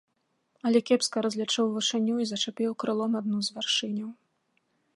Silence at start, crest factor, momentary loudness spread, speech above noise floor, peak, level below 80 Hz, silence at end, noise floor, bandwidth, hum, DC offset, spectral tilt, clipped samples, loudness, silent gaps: 0.65 s; 18 dB; 6 LU; 46 dB; -10 dBFS; -80 dBFS; 0.85 s; -73 dBFS; 11.5 kHz; none; under 0.1%; -3.5 dB/octave; under 0.1%; -28 LUFS; none